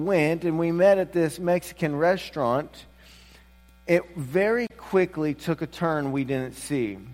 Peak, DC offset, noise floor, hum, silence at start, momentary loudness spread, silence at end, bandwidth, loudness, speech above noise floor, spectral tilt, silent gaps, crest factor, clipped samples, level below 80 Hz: -6 dBFS; under 0.1%; -53 dBFS; none; 0 s; 8 LU; 0 s; 16 kHz; -25 LUFS; 29 dB; -6.5 dB/octave; none; 18 dB; under 0.1%; -54 dBFS